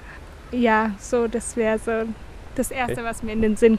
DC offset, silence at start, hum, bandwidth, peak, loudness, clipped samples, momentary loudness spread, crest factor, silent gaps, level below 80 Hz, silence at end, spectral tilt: under 0.1%; 0 s; none; 15 kHz; -4 dBFS; -23 LUFS; under 0.1%; 14 LU; 18 dB; none; -40 dBFS; 0 s; -5 dB/octave